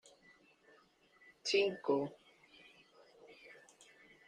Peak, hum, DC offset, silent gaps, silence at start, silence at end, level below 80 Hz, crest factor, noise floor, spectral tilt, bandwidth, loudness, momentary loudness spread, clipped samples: -22 dBFS; none; under 0.1%; none; 1.45 s; 0.75 s; -84 dBFS; 22 dB; -68 dBFS; -3.5 dB/octave; 10 kHz; -36 LUFS; 28 LU; under 0.1%